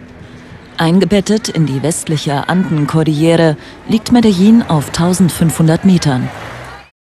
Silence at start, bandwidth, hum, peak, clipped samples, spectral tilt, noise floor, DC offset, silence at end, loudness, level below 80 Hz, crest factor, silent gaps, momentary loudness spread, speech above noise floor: 0 s; 13 kHz; none; 0 dBFS; under 0.1%; -6 dB/octave; -34 dBFS; under 0.1%; 0.3 s; -12 LUFS; -42 dBFS; 12 dB; none; 13 LU; 23 dB